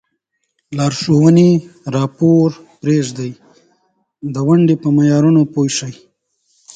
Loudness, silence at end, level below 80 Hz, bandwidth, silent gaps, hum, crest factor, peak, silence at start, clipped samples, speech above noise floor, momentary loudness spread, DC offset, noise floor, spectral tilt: -14 LUFS; 0.8 s; -54 dBFS; 9.2 kHz; none; none; 14 dB; 0 dBFS; 0.7 s; under 0.1%; 57 dB; 15 LU; under 0.1%; -70 dBFS; -7 dB/octave